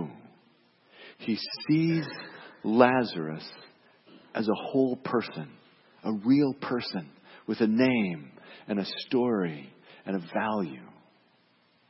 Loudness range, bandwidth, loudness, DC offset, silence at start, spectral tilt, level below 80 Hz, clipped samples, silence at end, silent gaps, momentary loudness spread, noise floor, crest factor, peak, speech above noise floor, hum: 4 LU; 5.8 kHz; -28 LUFS; under 0.1%; 0 s; -10 dB/octave; -74 dBFS; under 0.1%; 1 s; none; 20 LU; -66 dBFS; 24 dB; -6 dBFS; 38 dB; none